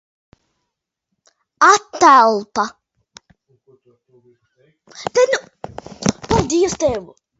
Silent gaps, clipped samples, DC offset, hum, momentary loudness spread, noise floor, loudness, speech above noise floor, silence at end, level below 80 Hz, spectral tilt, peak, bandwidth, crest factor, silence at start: none; under 0.1%; under 0.1%; none; 18 LU; -78 dBFS; -15 LUFS; 63 dB; 0.35 s; -44 dBFS; -4 dB/octave; 0 dBFS; 8 kHz; 18 dB; 1.6 s